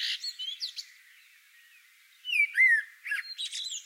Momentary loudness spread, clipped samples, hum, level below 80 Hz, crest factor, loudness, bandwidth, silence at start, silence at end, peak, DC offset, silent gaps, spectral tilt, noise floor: 15 LU; under 0.1%; none; under -90 dBFS; 18 dB; -27 LUFS; 16 kHz; 0 s; 0 s; -14 dBFS; under 0.1%; none; 11.5 dB/octave; -59 dBFS